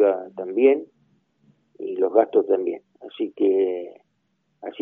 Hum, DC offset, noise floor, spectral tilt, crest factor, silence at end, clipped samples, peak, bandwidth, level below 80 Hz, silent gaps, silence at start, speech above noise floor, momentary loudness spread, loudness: none; under 0.1%; -71 dBFS; -4 dB/octave; 20 dB; 0 s; under 0.1%; -2 dBFS; 3.7 kHz; -82 dBFS; none; 0 s; 50 dB; 18 LU; -22 LUFS